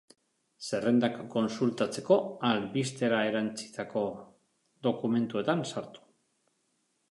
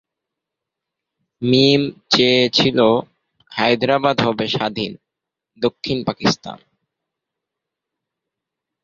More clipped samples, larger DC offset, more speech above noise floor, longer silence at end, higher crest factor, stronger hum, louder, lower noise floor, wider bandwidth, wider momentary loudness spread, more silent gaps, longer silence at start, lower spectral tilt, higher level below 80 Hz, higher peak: neither; neither; second, 46 dB vs 66 dB; second, 1.15 s vs 2.3 s; about the same, 22 dB vs 20 dB; neither; second, -30 LUFS vs -17 LUFS; second, -75 dBFS vs -83 dBFS; first, 11.5 kHz vs 7.4 kHz; about the same, 11 LU vs 12 LU; neither; second, 0.6 s vs 1.4 s; about the same, -5.5 dB/octave vs -5 dB/octave; second, -74 dBFS vs -56 dBFS; second, -10 dBFS vs -2 dBFS